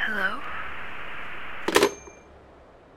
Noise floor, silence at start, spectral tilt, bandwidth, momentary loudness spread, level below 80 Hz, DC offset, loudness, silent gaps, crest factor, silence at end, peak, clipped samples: -51 dBFS; 0 s; -2.5 dB/octave; 16.5 kHz; 15 LU; -54 dBFS; 2%; -27 LUFS; none; 26 dB; 0 s; -2 dBFS; under 0.1%